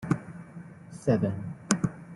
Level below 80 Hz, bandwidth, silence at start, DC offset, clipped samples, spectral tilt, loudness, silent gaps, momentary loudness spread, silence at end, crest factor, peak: -60 dBFS; 12 kHz; 0 s; under 0.1%; under 0.1%; -6 dB/octave; -29 LUFS; none; 19 LU; 0 s; 28 dB; -2 dBFS